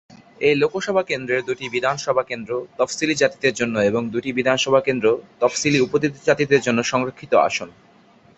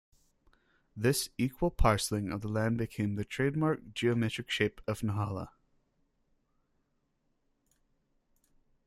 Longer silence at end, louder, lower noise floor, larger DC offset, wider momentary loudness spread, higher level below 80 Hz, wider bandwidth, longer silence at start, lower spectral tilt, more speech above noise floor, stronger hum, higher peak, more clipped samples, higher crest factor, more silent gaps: second, 0.7 s vs 3.35 s; first, -20 LUFS vs -32 LUFS; second, -52 dBFS vs -77 dBFS; neither; about the same, 6 LU vs 6 LU; second, -58 dBFS vs -46 dBFS; second, 8.2 kHz vs 15.5 kHz; second, 0.1 s vs 0.95 s; second, -4 dB/octave vs -5.5 dB/octave; second, 32 dB vs 46 dB; neither; first, -2 dBFS vs -12 dBFS; neither; about the same, 18 dB vs 22 dB; neither